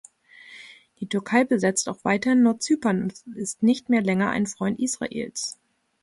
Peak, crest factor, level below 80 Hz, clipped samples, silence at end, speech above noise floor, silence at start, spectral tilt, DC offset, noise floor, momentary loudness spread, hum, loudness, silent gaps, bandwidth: -8 dBFS; 16 dB; -64 dBFS; under 0.1%; 0.5 s; 26 dB; 0.45 s; -4.5 dB/octave; under 0.1%; -49 dBFS; 13 LU; none; -24 LUFS; none; 11.5 kHz